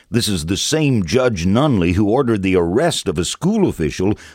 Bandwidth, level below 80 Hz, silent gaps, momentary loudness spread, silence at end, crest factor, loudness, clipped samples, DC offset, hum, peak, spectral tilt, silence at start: 16.5 kHz; -38 dBFS; none; 4 LU; 0.05 s; 16 dB; -17 LUFS; under 0.1%; under 0.1%; none; 0 dBFS; -5.5 dB/octave; 0.1 s